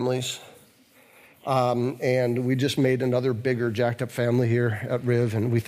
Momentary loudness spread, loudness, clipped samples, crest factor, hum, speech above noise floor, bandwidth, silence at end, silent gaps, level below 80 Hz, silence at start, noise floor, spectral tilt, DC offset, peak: 5 LU; -25 LUFS; under 0.1%; 14 dB; none; 33 dB; 15.5 kHz; 0 s; none; -66 dBFS; 0 s; -56 dBFS; -6.5 dB/octave; under 0.1%; -10 dBFS